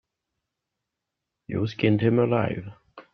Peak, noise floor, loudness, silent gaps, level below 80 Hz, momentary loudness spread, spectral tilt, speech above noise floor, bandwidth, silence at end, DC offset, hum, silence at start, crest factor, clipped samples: -8 dBFS; -84 dBFS; -24 LUFS; none; -60 dBFS; 14 LU; -9 dB/octave; 61 dB; 6.4 kHz; 0.1 s; under 0.1%; none; 1.5 s; 20 dB; under 0.1%